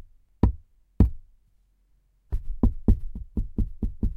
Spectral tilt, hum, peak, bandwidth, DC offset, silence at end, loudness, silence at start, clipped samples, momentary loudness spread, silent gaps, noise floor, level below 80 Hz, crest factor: -11 dB/octave; none; -6 dBFS; 2.9 kHz; under 0.1%; 0 s; -28 LUFS; 0 s; under 0.1%; 12 LU; none; -64 dBFS; -28 dBFS; 22 dB